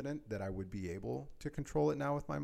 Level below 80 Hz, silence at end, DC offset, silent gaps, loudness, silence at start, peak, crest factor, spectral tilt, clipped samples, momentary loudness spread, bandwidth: -56 dBFS; 0 s; under 0.1%; none; -39 LUFS; 0 s; -24 dBFS; 16 dB; -7.5 dB/octave; under 0.1%; 9 LU; 14 kHz